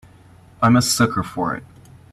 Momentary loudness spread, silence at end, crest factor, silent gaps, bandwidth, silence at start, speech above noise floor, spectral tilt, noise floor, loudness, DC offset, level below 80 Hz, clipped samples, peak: 10 LU; 0.5 s; 18 dB; none; 13.5 kHz; 0.6 s; 29 dB; -4.5 dB/octave; -47 dBFS; -18 LUFS; under 0.1%; -50 dBFS; under 0.1%; -4 dBFS